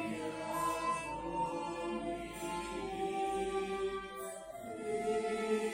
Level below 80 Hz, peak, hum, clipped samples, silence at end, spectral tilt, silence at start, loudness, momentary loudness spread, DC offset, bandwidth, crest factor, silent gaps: -60 dBFS; -24 dBFS; none; under 0.1%; 0 s; -4.5 dB/octave; 0 s; -38 LUFS; 8 LU; under 0.1%; 16 kHz; 14 dB; none